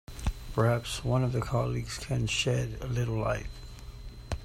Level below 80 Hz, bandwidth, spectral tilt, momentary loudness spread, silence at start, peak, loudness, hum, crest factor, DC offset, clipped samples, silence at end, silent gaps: -42 dBFS; 15 kHz; -5.5 dB/octave; 18 LU; 0.1 s; -12 dBFS; -31 LUFS; none; 18 dB; under 0.1%; under 0.1%; 0 s; none